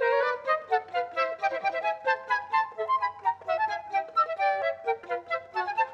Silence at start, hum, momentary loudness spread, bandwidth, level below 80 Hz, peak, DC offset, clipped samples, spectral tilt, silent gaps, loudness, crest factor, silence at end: 0 s; none; 5 LU; 8.4 kHz; -78 dBFS; -14 dBFS; under 0.1%; under 0.1%; -3 dB/octave; none; -28 LUFS; 14 dB; 0 s